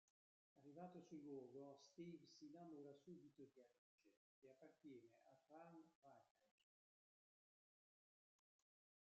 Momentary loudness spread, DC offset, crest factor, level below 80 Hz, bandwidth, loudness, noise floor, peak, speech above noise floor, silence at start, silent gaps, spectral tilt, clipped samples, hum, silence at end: 9 LU; under 0.1%; 20 dB; under -90 dBFS; 7.4 kHz; -63 LUFS; under -90 dBFS; -46 dBFS; over 27 dB; 0.55 s; 3.78-3.98 s, 4.17-4.42 s, 5.95-6.02 s, 6.31-6.35 s; -6.5 dB/octave; under 0.1%; none; 2.55 s